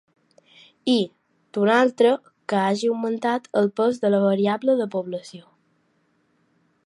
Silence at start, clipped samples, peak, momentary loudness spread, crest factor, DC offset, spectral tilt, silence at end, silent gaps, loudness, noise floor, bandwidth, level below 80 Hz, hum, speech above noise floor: 0.85 s; under 0.1%; -6 dBFS; 12 LU; 18 dB; under 0.1%; -6 dB/octave; 1.45 s; none; -22 LUFS; -66 dBFS; 11 kHz; -78 dBFS; none; 45 dB